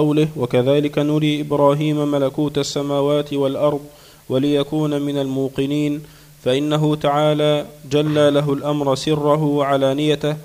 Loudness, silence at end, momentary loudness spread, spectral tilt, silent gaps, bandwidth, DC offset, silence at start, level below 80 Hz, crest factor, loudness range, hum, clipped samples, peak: -18 LUFS; 0 s; 5 LU; -6.5 dB/octave; none; 15.5 kHz; under 0.1%; 0 s; -52 dBFS; 16 dB; 3 LU; none; under 0.1%; -2 dBFS